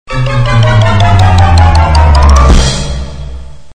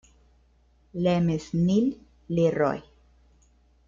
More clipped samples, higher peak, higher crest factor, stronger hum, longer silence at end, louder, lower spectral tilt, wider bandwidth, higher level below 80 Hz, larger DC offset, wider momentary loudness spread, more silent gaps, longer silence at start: first, 5% vs under 0.1%; first, 0 dBFS vs -10 dBFS; second, 6 dB vs 16 dB; neither; second, 0 s vs 1.05 s; first, -7 LUFS vs -25 LUFS; second, -5.5 dB/octave vs -8 dB/octave; first, 9.8 kHz vs 7.4 kHz; first, -10 dBFS vs -54 dBFS; first, 4% vs under 0.1%; about the same, 14 LU vs 13 LU; neither; second, 0.1 s vs 0.95 s